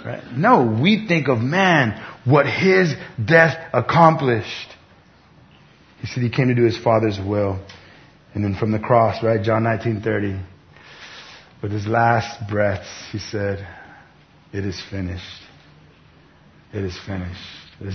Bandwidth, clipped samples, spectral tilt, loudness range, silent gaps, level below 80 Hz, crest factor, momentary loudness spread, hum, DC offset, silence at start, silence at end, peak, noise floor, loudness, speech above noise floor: 6.6 kHz; under 0.1%; -7 dB/octave; 14 LU; none; -52 dBFS; 20 dB; 19 LU; none; under 0.1%; 0 s; 0 s; 0 dBFS; -51 dBFS; -19 LUFS; 32 dB